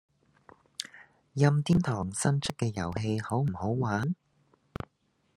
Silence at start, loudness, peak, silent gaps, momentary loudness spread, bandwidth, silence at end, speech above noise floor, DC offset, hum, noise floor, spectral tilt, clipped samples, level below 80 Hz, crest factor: 0.8 s; -30 LUFS; -10 dBFS; none; 17 LU; 12.5 kHz; 1.2 s; 44 dB; under 0.1%; none; -72 dBFS; -6 dB/octave; under 0.1%; -58 dBFS; 22 dB